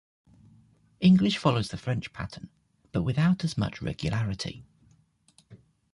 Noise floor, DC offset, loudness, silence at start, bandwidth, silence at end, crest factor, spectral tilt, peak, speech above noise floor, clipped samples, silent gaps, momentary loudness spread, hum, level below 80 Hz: -64 dBFS; under 0.1%; -27 LUFS; 1 s; 11.5 kHz; 0.35 s; 20 dB; -6.5 dB/octave; -10 dBFS; 37 dB; under 0.1%; none; 17 LU; none; -52 dBFS